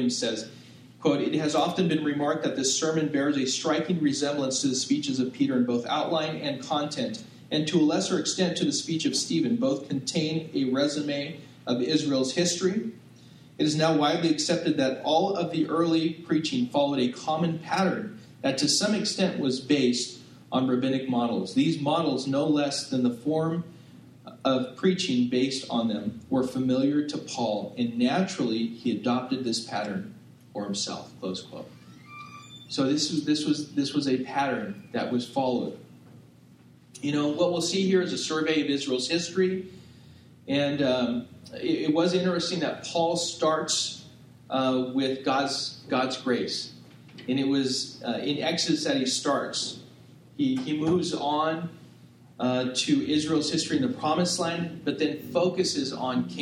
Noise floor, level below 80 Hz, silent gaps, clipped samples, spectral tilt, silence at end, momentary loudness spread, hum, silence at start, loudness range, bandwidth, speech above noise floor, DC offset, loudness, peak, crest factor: -54 dBFS; -70 dBFS; none; under 0.1%; -4.5 dB/octave; 0 s; 9 LU; none; 0 s; 3 LU; 13 kHz; 28 dB; under 0.1%; -27 LUFS; -8 dBFS; 18 dB